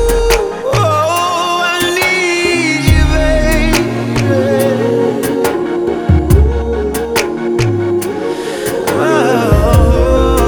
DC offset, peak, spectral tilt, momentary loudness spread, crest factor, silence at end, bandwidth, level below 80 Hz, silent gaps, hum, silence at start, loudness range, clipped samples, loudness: under 0.1%; 0 dBFS; -5.5 dB/octave; 5 LU; 12 dB; 0 s; over 20 kHz; -18 dBFS; none; none; 0 s; 2 LU; under 0.1%; -12 LUFS